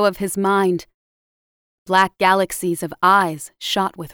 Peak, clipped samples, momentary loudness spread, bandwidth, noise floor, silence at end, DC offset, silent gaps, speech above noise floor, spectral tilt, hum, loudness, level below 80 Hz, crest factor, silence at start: -2 dBFS; under 0.1%; 9 LU; over 20 kHz; under -90 dBFS; 0.05 s; under 0.1%; 0.94-1.86 s; over 71 dB; -4 dB/octave; none; -18 LUFS; -56 dBFS; 16 dB; 0 s